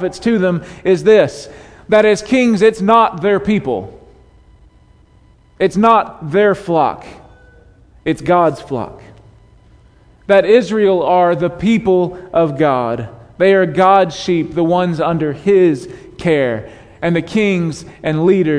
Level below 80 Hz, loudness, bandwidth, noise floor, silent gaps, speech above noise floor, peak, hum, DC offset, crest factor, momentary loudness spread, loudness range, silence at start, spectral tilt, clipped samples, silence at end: -46 dBFS; -14 LUFS; 10.5 kHz; -48 dBFS; none; 34 dB; 0 dBFS; none; under 0.1%; 14 dB; 13 LU; 4 LU; 0 s; -6.5 dB/octave; under 0.1%; 0 s